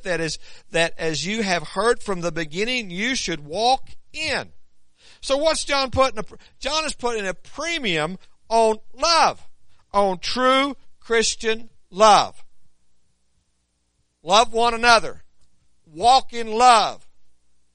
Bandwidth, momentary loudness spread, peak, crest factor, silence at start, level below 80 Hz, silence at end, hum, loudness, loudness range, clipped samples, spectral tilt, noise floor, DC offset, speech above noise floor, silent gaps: 10.5 kHz; 13 LU; 0 dBFS; 22 dB; 0 s; -46 dBFS; 0.45 s; none; -20 LUFS; 5 LU; under 0.1%; -2.5 dB/octave; -68 dBFS; under 0.1%; 48 dB; none